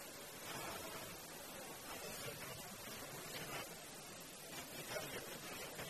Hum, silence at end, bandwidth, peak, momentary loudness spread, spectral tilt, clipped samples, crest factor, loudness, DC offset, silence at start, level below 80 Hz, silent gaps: none; 0 s; 13.5 kHz; -32 dBFS; 5 LU; -2.5 dB/octave; under 0.1%; 18 dB; -48 LUFS; under 0.1%; 0 s; -72 dBFS; none